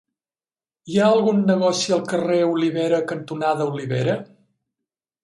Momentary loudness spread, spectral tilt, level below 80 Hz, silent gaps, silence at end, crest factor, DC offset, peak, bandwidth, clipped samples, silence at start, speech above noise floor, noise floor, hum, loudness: 7 LU; -5.5 dB/octave; -66 dBFS; none; 1 s; 16 dB; under 0.1%; -6 dBFS; 11.5 kHz; under 0.1%; 0.85 s; over 70 dB; under -90 dBFS; none; -20 LUFS